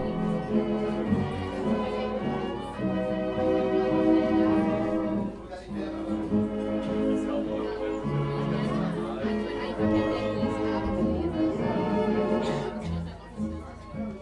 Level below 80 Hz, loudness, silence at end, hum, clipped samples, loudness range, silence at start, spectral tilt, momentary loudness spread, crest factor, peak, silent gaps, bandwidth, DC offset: -46 dBFS; -28 LUFS; 0 s; none; under 0.1%; 3 LU; 0 s; -8 dB/octave; 10 LU; 16 dB; -10 dBFS; none; 11 kHz; under 0.1%